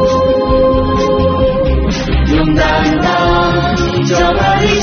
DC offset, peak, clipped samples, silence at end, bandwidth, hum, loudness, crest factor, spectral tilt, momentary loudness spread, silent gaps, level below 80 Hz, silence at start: under 0.1%; 0 dBFS; under 0.1%; 0 s; 6.8 kHz; none; -12 LUFS; 10 dB; -5 dB/octave; 3 LU; none; -20 dBFS; 0 s